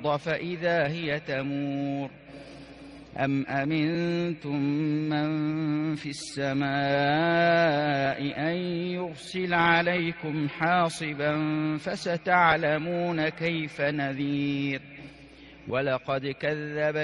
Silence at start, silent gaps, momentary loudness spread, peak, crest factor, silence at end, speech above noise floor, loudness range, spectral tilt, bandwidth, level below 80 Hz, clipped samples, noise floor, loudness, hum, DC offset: 0 s; none; 12 LU; -8 dBFS; 20 dB; 0 s; 22 dB; 5 LU; -6 dB/octave; 11.5 kHz; -62 dBFS; under 0.1%; -49 dBFS; -27 LUFS; none; under 0.1%